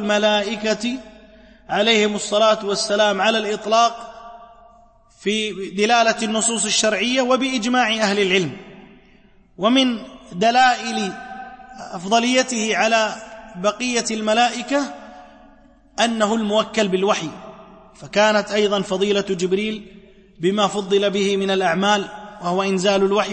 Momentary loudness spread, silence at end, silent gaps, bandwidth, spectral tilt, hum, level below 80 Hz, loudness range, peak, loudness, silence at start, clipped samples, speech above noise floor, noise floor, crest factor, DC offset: 15 LU; 0 s; none; 8.8 kHz; -3 dB/octave; none; -56 dBFS; 3 LU; -4 dBFS; -19 LUFS; 0 s; under 0.1%; 32 dB; -51 dBFS; 16 dB; under 0.1%